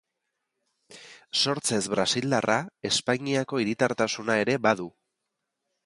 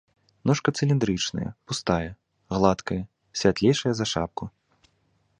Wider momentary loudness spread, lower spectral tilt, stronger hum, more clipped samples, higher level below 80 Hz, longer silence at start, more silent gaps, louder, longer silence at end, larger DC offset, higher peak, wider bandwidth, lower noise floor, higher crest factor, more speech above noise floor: second, 4 LU vs 11 LU; second, -3.5 dB/octave vs -5.5 dB/octave; neither; neither; second, -66 dBFS vs -48 dBFS; first, 0.9 s vs 0.45 s; neither; about the same, -26 LUFS vs -25 LUFS; about the same, 0.95 s vs 0.9 s; neither; about the same, -6 dBFS vs -4 dBFS; about the same, 11.5 kHz vs 10.5 kHz; first, -82 dBFS vs -68 dBFS; about the same, 22 dB vs 22 dB; first, 56 dB vs 44 dB